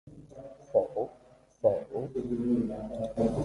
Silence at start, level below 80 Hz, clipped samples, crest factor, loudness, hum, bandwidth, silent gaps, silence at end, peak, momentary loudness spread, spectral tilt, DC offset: 0.05 s; -54 dBFS; under 0.1%; 20 dB; -31 LUFS; none; 11 kHz; none; 0 s; -12 dBFS; 19 LU; -9 dB/octave; under 0.1%